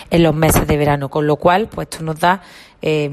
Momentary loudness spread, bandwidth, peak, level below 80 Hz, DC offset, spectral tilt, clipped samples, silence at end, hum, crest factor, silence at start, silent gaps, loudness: 11 LU; 14 kHz; -2 dBFS; -32 dBFS; under 0.1%; -5.5 dB/octave; under 0.1%; 0 s; none; 14 dB; 0 s; none; -16 LUFS